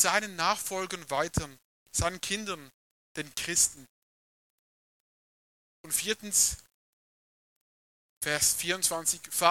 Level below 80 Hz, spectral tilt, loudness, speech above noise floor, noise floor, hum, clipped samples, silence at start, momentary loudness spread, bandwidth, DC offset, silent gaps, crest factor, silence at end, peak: -56 dBFS; -1.5 dB/octave; -28 LUFS; over 60 dB; under -90 dBFS; none; under 0.1%; 0 s; 13 LU; 17.5 kHz; under 0.1%; 1.64-1.86 s, 2.74-3.15 s, 3.89-5.84 s, 6.74-8.21 s; 26 dB; 0 s; -6 dBFS